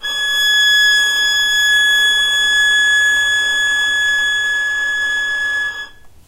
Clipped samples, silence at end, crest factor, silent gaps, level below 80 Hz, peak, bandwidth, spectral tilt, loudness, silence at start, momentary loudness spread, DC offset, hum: under 0.1%; 0.2 s; 10 dB; none; -50 dBFS; -4 dBFS; 16 kHz; 2.5 dB/octave; -12 LUFS; 0 s; 7 LU; under 0.1%; none